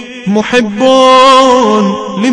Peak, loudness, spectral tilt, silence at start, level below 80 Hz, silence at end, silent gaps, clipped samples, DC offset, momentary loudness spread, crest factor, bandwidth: 0 dBFS; -7 LUFS; -4.5 dB/octave; 0 s; -44 dBFS; 0 s; none; 2%; under 0.1%; 10 LU; 8 dB; 10.5 kHz